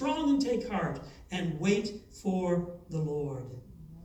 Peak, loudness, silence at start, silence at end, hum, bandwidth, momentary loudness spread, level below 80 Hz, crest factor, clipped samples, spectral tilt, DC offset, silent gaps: -14 dBFS; -32 LUFS; 0 s; 0 s; none; 12.5 kHz; 14 LU; -56 dBFS; 16 dB; under 0.1%; -6.5 dB/octave; under 0.1%; none